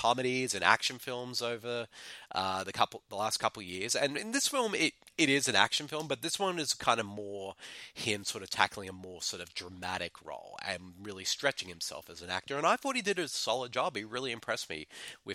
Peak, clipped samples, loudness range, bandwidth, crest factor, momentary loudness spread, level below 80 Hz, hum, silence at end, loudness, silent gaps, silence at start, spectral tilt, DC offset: -6 dBFS; under 0.1%; 6 LU; 16.5 kHz; 28 dB; 14 LU; -72 dBFS; none; 0 s; -33 LUFS; none; 0 s; -2 dB/octave; under 0.1%